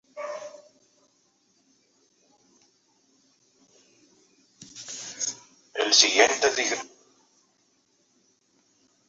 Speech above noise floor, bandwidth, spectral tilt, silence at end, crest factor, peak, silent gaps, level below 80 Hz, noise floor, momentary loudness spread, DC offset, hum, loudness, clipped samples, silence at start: 46 dB; 8 kHz; 1 dB/octave; 2.2 s; 28 dB; -2 dBFS; none; -76 dBFS; -68 dBFS; 27 LU; under 0.1%; none; -23 LUFS; under 0.1%; 0.15 s